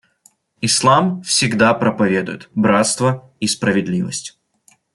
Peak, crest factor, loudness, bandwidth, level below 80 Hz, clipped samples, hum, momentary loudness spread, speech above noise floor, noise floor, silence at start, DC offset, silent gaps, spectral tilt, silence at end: -2 dBFS; 16 dB; -16 LUFS; 12 kHz; -54 dBFS; under 0.1%; none; 10 LU; 40 dB; -56 dBFS; 0.6 s; under 0.1%; none; -4 dB/octave; 0.65 s